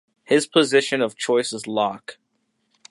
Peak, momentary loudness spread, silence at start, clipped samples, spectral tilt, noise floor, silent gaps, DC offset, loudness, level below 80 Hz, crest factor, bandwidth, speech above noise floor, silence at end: -2 dBFS; 8 LU; 0.3 s; under 0.1%; -3.5 dB/octave; -71 dBFS; none; under 0.1%; -21 LUFS; -72 dBFS; 20 dB; 11.5 kHz; 51 dB; 0.8 s